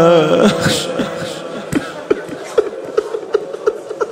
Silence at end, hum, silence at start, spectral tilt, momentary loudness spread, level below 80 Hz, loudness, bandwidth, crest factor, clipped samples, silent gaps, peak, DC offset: 0 s; none; 0 s; -5 dB/octave; 10 LU; -50 dBFS; -17 LUFS; 16 kHz; 16 dB; under 0.1%; none; 0 dBFS; under 0.1%